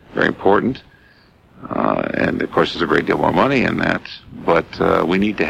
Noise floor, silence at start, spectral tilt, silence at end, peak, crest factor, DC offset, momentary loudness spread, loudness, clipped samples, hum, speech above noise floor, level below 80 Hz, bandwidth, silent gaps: -50 dBFS; 0.1 s; -7 dB/octave; 0 s; -2 dBFS; 16 dB; under 0.1%; 9 LU; -18 LUFS; under 0.1%; none; 33 dB; -44 dBFS; 12.5 kHz; none